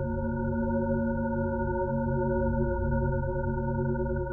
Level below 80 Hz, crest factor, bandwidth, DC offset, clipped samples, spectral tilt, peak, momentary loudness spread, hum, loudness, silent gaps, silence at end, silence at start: -36 dBFS; 14 dB; 1.6 kHz; under 0.1%; under 0.1%; -12.5 dB/octave; -14 dBFS; 3 LU; none; -29 LUFS; none; 0 s; 0 s